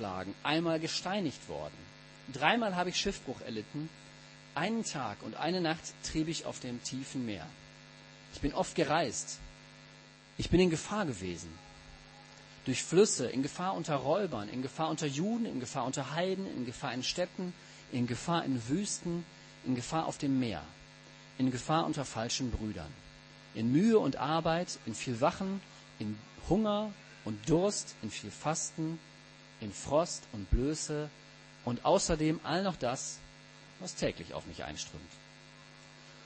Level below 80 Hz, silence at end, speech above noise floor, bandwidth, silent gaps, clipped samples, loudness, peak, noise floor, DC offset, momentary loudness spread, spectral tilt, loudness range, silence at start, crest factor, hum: -52 dBFS; 0 s; 22 dB; 8.8 kHz; none; under 0.1%; -34 LUFS; -10 dBFS; -56 dBFS; under 0.1%; 23 LU; -4.5 dB/octave; 4 LU; 0 s; 24 dB; none